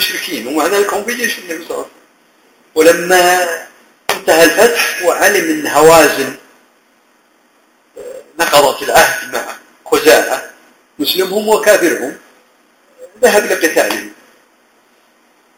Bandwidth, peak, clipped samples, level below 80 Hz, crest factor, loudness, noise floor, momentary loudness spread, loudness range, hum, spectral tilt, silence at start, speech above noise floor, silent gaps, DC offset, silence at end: over 20 kHz; 0 dBFS; 0.4%; -50 dBFS; 14 dB; -11 LUFS; -53 dBFS; 16 LU; 4 LU; none; -2 dB/octave; 0 s; 41 dB; none; under 0.1%; 1.5 s